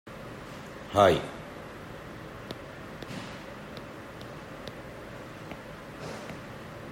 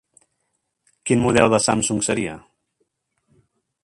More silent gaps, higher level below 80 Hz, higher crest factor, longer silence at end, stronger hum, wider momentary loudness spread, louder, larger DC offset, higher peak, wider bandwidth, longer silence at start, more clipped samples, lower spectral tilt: neither; second, -56 dBFS vs -50 dBFS; first, 28 dB vs 22 dB; second, 0 s vs 1.45 s; neither; first, 18 LU vs 15 LU; second, -34 LUFS vs -19 LUFS; neither; second, -6 dBFS vs 0 dBFS; first, 16 kHz vs 11.5 kHz; second, 0.05 s vs 1.05 s; neither; first, -5.5 dB/octave vs -4 dB/octave